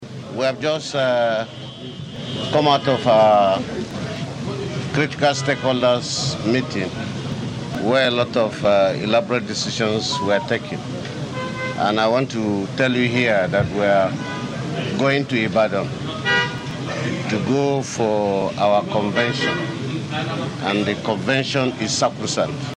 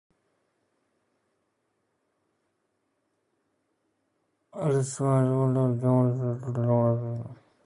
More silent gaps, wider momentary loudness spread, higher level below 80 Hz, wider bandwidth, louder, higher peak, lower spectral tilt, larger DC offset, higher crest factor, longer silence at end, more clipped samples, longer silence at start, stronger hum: neither; about the same, 10 LU vs 11 LU; first, -54 dBFS vs -68 dBFS; about the same, 11 kHz vs 11 kHz; first, -20 LUFS vs -26 LUFS; first, -2 dBFS vs -12 dBFS; second, -5 dB/octave vs -8.5 dB/octave; neither; about the same, 18 dB vs 18 dB; second, 0 s vs 0.3 s; neither; second, 0 s vs 4.55 s; neither